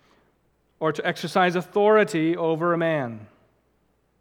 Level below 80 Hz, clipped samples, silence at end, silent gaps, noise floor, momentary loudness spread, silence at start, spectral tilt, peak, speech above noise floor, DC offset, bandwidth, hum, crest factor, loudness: -72 dBFS; under 0.1%; 0.95 s; none; -67 dBFS; 9 LU; 0.8 s; -6 dB/octave; -6 dBFS; 45 dB; under 0.1%; 16 kHz; none; 18 dB; -23 LUFS